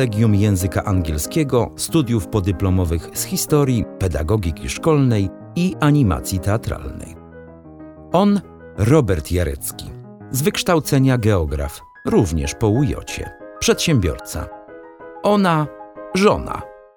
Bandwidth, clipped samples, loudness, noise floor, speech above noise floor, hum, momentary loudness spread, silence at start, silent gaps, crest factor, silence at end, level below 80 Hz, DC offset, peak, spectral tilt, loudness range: over 20 kHz; under 0.1%; -19 LUFS; -39 dBFS; 22 dB; none; 17 LU; 0 s; none; 18 dB; 0.2 s; -34 dBFS; under 0.1%; -2 dBFS; -6 dB/octave; 2 LU